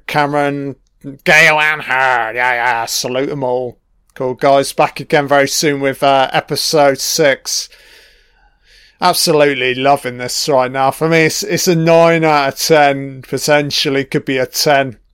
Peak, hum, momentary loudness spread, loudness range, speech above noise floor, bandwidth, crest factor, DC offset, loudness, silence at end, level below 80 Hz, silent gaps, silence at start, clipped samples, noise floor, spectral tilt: 0 dBFS; none; 9 LU; 3 LU; 38 dB; 17 kHz; 14 dB; under 0.1%; -13 LUFS; 0.2 s; -52 dBFS; none; 0.1 s; under 0.1%; -52 dBFS; -3.5 dB/octave